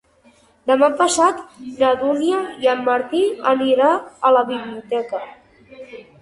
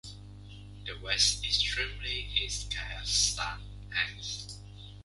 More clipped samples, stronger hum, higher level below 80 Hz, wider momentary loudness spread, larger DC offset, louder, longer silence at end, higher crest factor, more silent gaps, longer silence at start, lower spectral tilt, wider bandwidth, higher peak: neither; second, none vs 50 Hz at -40 dBFS; second, -62 dBFS vs -44 dBFS; second, 15 LU vs 22 LU; neither; first, -18 LUFS vs -30 LUFS; first, 0.2 s vs 0 s; second, 16 dB vs 22 dB; neither; first, 0.65 s vs 0.05 s; first, -3 dB/octave vs 0 dB/octave; about the same, 11.5 kHz vs 11.5 kHz; first, -2 dBFS vs -12 dBFS